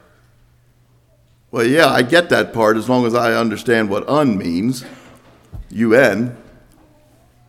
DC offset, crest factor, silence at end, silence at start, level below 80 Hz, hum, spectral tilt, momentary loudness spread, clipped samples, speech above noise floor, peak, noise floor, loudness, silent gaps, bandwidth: under 0.1%; 18 dB; 1.15 s; 1.55 s; -48 dBFS; none; -5.5 dB/octave; 10 LU; under 0.1%; 39 dB; 0 dBFS; -54 dBFS; -15 LUFS; none; 16 kHz